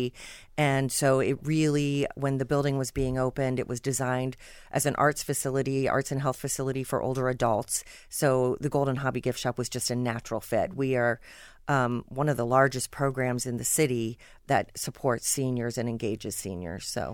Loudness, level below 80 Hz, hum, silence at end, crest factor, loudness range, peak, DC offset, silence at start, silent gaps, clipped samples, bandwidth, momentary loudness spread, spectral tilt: -28 LUFS; -52 dBFS; none; 0 s; 18 dB; 2 LU; -10 dBFS; under 0.1%; 0 s; none; under 0.1%; 18 kHz; 9 LU; -5 dB/octave